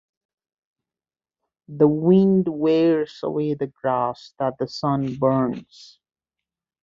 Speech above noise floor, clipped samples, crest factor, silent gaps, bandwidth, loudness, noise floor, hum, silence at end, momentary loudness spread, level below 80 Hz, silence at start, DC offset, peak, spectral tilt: over 69 dB; under 0.1%; 18 dB; none; 7.4 kHz; -21 LUFS; under -90 dBFS; none; 1.2 s; 11 LU; -60 dBFS; 1.7 s; under 0.1%; -4 dBFS; -8.5 dB/octave